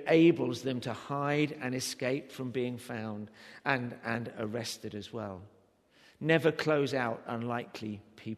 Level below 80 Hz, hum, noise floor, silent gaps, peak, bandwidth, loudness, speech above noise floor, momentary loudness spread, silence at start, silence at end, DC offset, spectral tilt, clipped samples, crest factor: -74 dBFS; none; -65 dBFS; none; -10 dBFS; 13.5 kHz; -33 LUFS; 33 dB; 14 LU; 0 s; 0 s; under 0.1%; -5.5 dB/octave; under 0.1%; 22 dB